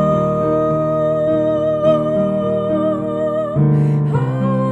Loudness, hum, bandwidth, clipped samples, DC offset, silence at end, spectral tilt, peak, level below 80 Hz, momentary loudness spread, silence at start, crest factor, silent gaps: -17 LUFS; none; 7.8 kHz; under 0.1%; under 0.1%; 0 s; -10 dB/octave; -4 dBFS; -44 dBFS; 3 LU; 0 s; 12 dB; none